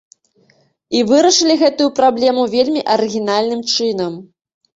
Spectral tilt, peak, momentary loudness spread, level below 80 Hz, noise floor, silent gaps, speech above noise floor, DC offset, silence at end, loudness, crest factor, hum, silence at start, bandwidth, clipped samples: -3 dB/octave; -2 dBFS; 9 LU; -60 dBFS; -56 dBFS; none; 42 dB; under 0.1%; 0.55 s; -14 LUFS; 14 dB; none; 0.9 s; 8 kHz; under 0.1%